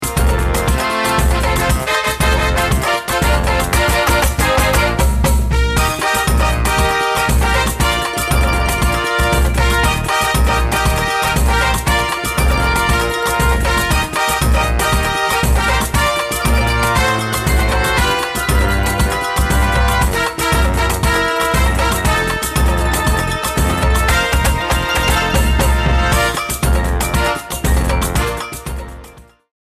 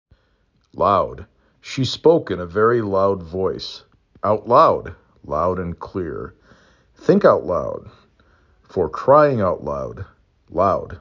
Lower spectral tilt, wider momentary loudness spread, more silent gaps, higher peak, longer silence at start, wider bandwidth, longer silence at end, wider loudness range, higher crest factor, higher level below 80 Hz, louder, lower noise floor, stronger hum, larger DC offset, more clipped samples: second, -4 dB/octave vs -7 dB/octave; second, 3 LU vs 18 LU; neither; about the same, -2 dBFS vs -2 dBFS; second, 0 s vs 0.75 s; first, 15.5 kHz vs 7.6 kHz; first, 0.55 s vs 0.05 s; about the same, 1 LU vs 3 LU; about the same, 14 dB vs 18 dB; first, -18 dBFS vs -44 dBFS; first, -15 LUFS vs -19 LUFS; second, -40 dBFS vs -63 dBFS; neither; neither; neither